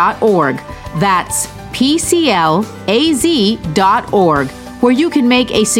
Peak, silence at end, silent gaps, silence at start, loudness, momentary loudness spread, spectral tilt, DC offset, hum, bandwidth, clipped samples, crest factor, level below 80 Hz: 0 dBFS; 0 s; none; 0 s; -13 LUFS; 6 LU; -4 dB/octave; under 0.1%; none; 17 kHz; under 0.1%; 12 dB; -40 dBFS